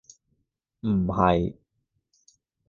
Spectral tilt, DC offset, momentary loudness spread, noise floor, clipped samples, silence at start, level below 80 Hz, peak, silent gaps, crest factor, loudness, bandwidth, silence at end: -8 dB/octave; under 0.1%; 11 LU; -76 dBFS; under 0.1%; 0.85 s; -46 dBFS; -4 dBFS; none; 24 dB; -25 LUFS; 7.2 kHz; 1.15 s